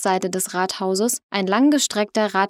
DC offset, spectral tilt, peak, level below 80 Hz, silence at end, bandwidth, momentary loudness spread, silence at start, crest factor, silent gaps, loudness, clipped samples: under 0.1%; -3.5 dB/octave; -4 dBFS; -72 dBFS; 0 s; 16.5 kHz; 6 LU; 0 s; 16 dB; 1.23-1.29 s; -20 LUFS; under 0.1%